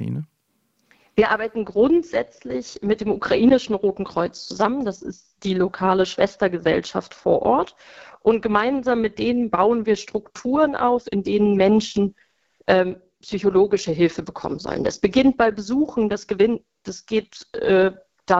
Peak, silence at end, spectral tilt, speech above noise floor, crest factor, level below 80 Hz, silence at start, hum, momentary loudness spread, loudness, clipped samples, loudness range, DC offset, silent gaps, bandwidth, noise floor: -2 dBFS; 0 s; -6 dB/octave; 49 dB; 20 dB; -52 dBFS; 0 s; none; 12 LU; -21 LUFS; under 0.1%; 2 LU; under 0.1%; none; 8 kHz; -69 dBFS